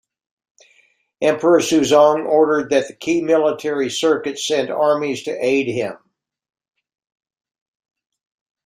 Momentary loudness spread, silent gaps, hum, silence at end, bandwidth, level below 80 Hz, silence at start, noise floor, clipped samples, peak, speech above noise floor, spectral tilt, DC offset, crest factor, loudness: 8 LU; none; none; 2.7 s; 15.5 kHz; -64 dBFS; 1.2 s; -59 dBFS; under 0.1%; -2 dBFS; 42 dB; -4 dB/octave; under 0.1%; 18 dB; -17 LUFS